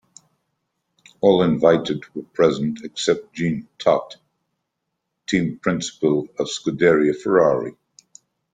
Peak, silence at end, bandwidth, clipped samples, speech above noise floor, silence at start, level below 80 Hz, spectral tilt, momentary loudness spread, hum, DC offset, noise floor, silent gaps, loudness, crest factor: -2 dBFS; 0.85 s; 9.4 kHz; under 0.1%; 59 dB; 1.25 s; -58 dBFS; -5.5 dB/octave; 10 LU; none; under 0.1%; -78 dBFS; none; -20 LUFS; 20 dB